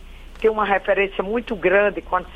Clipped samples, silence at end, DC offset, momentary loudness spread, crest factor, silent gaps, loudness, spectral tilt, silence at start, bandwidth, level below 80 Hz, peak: under 0.1%; 0 s; under 0.1%; 7 LU; 16 dB; none; -20 LUFS; -6.5 dB/octave; 0 s; 9 kHz; -40 dBFS; -6 dBFS